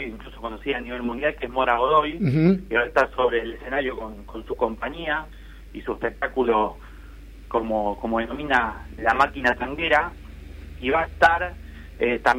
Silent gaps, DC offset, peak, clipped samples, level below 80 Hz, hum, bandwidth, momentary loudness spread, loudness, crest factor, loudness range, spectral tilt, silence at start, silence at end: none; under 0.1%; -4 dBFS; under 0.1%; -42 dBFS; none; 16 kHz; 16 LU; -23 LUFS; 20 dB; 5 LU; -6.5 dB/octave; 0 s; 0 s